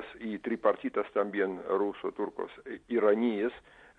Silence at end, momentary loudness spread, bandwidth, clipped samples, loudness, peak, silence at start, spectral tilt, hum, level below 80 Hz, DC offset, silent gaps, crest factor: 0.4 s; 13 LU; 4.6 kHz; under 0.1%; -31 LUFS; -12 dBFS; 0 s; -7.5 dB/octave; none; -68 dBFS; under 0.1%; none; 20 dB